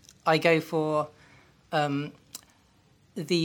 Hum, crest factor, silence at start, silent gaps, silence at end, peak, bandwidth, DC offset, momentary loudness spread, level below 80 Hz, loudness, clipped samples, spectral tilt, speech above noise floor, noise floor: none; 22 dB; 0.25 s; none; 0 s; -8 dBFS; 18.5 kHz; under 0.1%; 22 LU; -72 dBFS; -27 LUFS; under 0.1%; -5.5 dB/octave; 36 dB; -62 dBFS